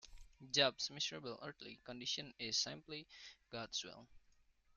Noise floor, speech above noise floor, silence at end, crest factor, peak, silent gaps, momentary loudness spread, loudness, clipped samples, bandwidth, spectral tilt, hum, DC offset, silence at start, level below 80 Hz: -73 dBFS; 29 dB; 0.6 s; 26 dB; -20 dBFS; none; 19 LU; -41 LUFS; under 0.1%; 12.5 kHz; -2 dB/octave; none; under 0.1%; 0.05 s; -70 dBFS